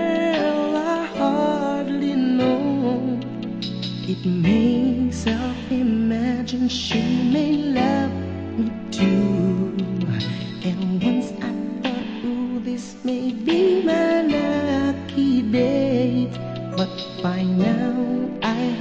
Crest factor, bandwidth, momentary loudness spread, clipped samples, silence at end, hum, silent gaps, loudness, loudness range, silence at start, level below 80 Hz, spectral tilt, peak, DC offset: 14 dB; 8.4 kHz; 8 LU; under 0.1%; 0 s; none; none; -22 LUFS; 3 LU; 0 s; -48 dBFS; -7 dB/octave; -6 dBFS; 0.2%